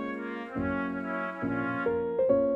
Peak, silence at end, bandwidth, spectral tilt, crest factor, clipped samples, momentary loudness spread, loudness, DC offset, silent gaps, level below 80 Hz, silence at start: -12 dBFS; 0 s; 5.2 kHz; -9 dB/octave; 18 dB; under 0.1%; 9 LU; -31 LUFS; under 0.1%; none; -56 dBFS; 0 s